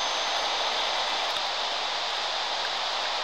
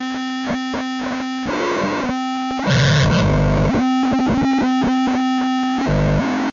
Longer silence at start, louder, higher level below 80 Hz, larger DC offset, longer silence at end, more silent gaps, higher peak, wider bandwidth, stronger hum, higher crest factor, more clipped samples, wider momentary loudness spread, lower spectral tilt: about the same, 0 s vs 0 s; second, -26 LUFS vs -18 LUFS; second, -62 dBFS vs -32 dBFS; first, 0.3% vs under 0.1%; about the same, 0 s vs 0 s; neither; second, -14 dBFS vs -8 dBFS; first, 17 kHz vs 7.4 kHz; neither; about the same, 14 dB vs 10 dB; neither; second, 2 LU vs 8 LU; second, 1 dB/octave vs -6 dB/octave